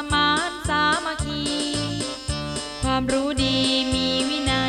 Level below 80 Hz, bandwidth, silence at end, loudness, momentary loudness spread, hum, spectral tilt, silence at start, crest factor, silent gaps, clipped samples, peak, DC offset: -38 dBFS; 13.5 kHz; 0 s; -22 LUFS; 8 LU; none; -3.5 dB/octave; 0 s; 16 dB; none; under 0.1%; -8 dBFS; under 0.1%